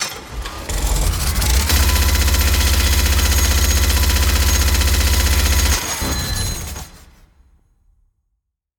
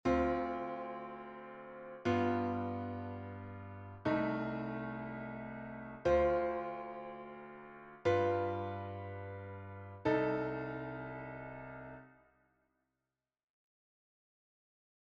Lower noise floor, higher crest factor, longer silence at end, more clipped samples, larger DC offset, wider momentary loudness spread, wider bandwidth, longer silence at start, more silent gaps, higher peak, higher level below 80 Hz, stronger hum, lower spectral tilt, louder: second, -73 dBFS vs under -90 dBFS; second, 14 dB vs 20 dB; second, 1.8 s vs 2.95 s; neither; neither; second, 10 LU vs 17 LU; first, 19.5 kHz vs 7.4 kHz; about the same, 0 s vs 0.05 s; neither; first, -2 dBFS vs -20 dBFS; first, -18 dBFS vs -60 dBFS; neither; second, -3 dB/octave vs -8 dB/octave; first, -16 LUFS vs -38 LUFS